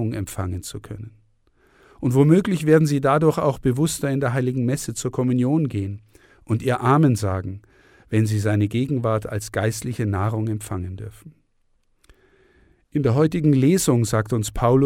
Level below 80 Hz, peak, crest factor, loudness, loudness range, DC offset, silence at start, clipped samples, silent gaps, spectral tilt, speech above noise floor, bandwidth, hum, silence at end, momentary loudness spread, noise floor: -46 dBFS; -4 dBFS; 18 dB; -21 LUFS; 7 LU; under 0.1%; 0 s; under 0.1%; none; -6.5 dB/octave; 44 dB; 16.5 kHz; none; 0 s; 15 LU; -64 dBFS